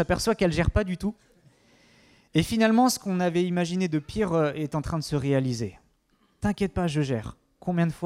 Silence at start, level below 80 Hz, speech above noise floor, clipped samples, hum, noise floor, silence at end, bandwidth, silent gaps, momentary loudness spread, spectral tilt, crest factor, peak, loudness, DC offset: 0 s; -42 dBFS; 42 dB; under 0.1%; none; -67 dBFS; 0 s; 16 kHz; none; 10 LU; -6 dB/octave; 18 dB; -8 dBFS; -26 LUFS; under 0.1%